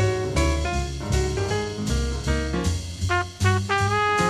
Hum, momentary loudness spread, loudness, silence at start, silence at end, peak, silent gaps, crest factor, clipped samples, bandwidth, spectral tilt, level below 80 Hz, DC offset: none; 5 LU; -24 LUFS; 0 s; 0 s; -6 dBFS; none; 16 dB; under 0.1%; 13.5 kHz; -5 dB/octave; -30 dBFS; under 0.1%